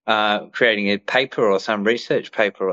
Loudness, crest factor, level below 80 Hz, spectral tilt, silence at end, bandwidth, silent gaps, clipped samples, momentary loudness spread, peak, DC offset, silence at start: -19 LUFS; 16 dB; -70 dBFS; -5 dB/octave; 0 s; 7.8 kHz; none; under 0.1%; 4 LU; -2 dBFS; under 0.1%; 0.05 s